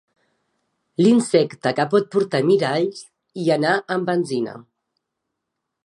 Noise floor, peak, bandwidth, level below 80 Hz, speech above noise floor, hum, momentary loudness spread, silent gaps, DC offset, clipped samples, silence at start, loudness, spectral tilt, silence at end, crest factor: -80 dBFS; -4 dBFS; 11.5 kHz; -72 dBFS; 61 dB; none; 11 LU; none; under 0.1%; under 0.1%; 1 s; -20 LUFS; -6 dB/octave; 1.25 s; 18 dB